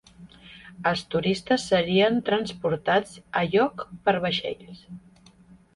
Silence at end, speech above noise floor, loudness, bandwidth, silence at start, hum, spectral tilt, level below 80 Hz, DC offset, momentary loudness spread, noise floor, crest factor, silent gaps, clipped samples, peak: 0.8 s; 29 dB; -25 LUFS; 11.5 kHz; 0.2 s; none; -5.5 dB/octave; -58 dBFS; under 0.1%; 16 LU; -54 dBFS; 18 dB; none; under 0.1%; -8 dBFS